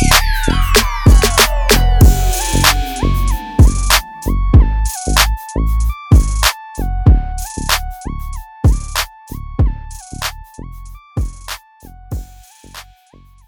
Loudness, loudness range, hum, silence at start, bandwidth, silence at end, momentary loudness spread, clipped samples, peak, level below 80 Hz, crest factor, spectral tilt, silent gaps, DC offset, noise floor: -14 LUFS; 12 LU; none; 0 s; over 20 kHz; 0.65 s; 18 LU; under 0.1%; 0 dBFS; -16 dBFS; 14 dB; -4 dB/octave; none; under 0.1%; -45 dBFS